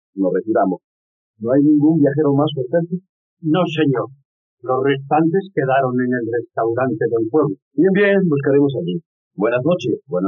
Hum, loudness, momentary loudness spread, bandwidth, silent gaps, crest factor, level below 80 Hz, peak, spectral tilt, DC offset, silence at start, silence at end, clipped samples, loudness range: none; -18 LUFS; 11 LU; 6.2 kHz; 0.84-1.34 s, 3.09-3.37 s, 4.25-4.58 s, 7.62-7.71 s, 9.06-9.31 s; 14 dB; -68 dBFS; -4 dBFS; -6.5 dB/octave; under 0.1%; 0.15 s; 0 s; under 0.1%; 2 LU